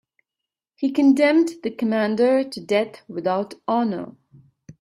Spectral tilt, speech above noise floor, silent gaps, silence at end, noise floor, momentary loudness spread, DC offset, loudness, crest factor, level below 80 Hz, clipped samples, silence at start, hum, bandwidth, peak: -6 dB/octave; 66 dB; none; 0.1 s; -86 dBFS; 11 LU; under 0.1%; -21 LUFS; 16 dB; -68 dBFS; under 0.1%; 0.8 s; none; 12 kHz; -6 dBFS